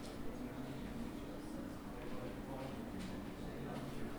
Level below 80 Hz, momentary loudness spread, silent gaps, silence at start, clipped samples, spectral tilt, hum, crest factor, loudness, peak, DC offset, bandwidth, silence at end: -56 dBFS; 2 LU; none; 0 s; under 0.1%; -6 dB/octave; none; 12 dB; -47 LUFS; -32 dBFS; under 0.1%; over 20 kHz; 0 s